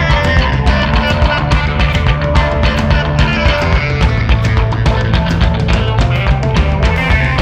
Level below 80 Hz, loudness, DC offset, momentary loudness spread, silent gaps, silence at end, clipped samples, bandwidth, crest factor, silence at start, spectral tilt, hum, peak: -16 dBFS; -13 LUFS; under 0.1%; 2 LU; none; 0 s; under 0.1%; 8.8 kHz; 12 dB; 0 s; -6.5 dB/octave; none; 0 dBFS